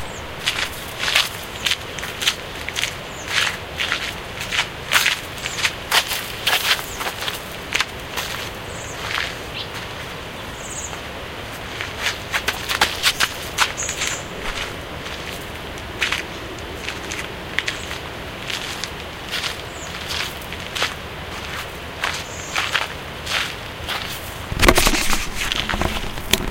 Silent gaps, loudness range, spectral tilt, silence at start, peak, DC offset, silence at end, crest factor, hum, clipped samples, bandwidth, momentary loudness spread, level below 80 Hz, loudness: none; 7 LU; -2 dB/octave; 0 s; 0 dBFS; under 0.1%; 0 s; 24 dB; none; under 0.1%; 17 kHz; 12 LU; -36 dBFS; -23 LUFS